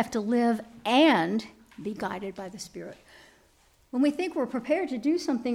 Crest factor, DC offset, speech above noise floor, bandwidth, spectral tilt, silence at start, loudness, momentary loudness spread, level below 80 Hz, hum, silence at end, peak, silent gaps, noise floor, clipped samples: 18 dB; under 0.1%; 36 dB; 14.5 kHz; -5 dB/octave; 0 s; -27 LUFS; 18 LU; -66 dBFS; none; 0 s; -10 dBFS; none; -63 dBFS; under 0.1%